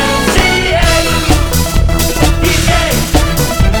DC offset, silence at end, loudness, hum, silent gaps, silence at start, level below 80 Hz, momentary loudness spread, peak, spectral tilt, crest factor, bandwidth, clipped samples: under 0.1%; 0 s; -11 LUFS; none; none; 0 s; -14 dBFS; 3 LU; 0 dBFS; -4 dB/octave; 10 dB; over 20 kHz; under 0.1%